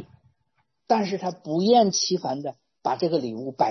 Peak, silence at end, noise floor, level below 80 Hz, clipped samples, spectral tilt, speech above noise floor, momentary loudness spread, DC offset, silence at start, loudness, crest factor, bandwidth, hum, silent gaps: -6 dBFS; 0 s; -73 dBFS; -70 dBFS; under 0.1%; -4.5 dB/octave; 50 dB; 13 LU; under 0.1%; 0 s; -24 LUFS; 18 dB; 6.4 kHz; none; none